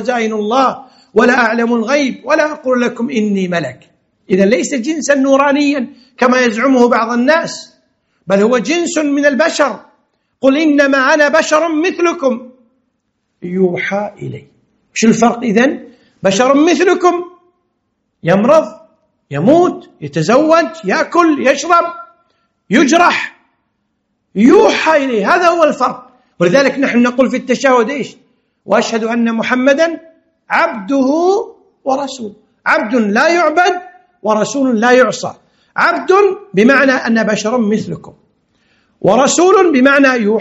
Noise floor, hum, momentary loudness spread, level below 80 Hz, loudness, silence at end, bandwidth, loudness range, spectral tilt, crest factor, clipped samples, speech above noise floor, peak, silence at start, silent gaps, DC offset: -67 dBFS; none; 13 LU; -58 dBFS; -12 LUFS; 0 s; 8.2 kHz; 3 LU; -4.5 dB/octave; 12 dB; 0.2%; 55 dB; 0 dBFS; 0 s; none; under 0.1%